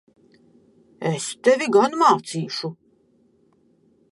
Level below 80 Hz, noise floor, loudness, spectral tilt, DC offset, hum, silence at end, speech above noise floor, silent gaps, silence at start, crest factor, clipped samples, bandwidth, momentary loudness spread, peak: -74 dBFS; -61 dBFS; -20 LUFS; -4.5 dB/octave; under 0.1%; none; 1.4 s; 41 dB; none; 1 s; 20 dB; under 0.1%; 11.5 kHz; 12 LU; -4 dBFS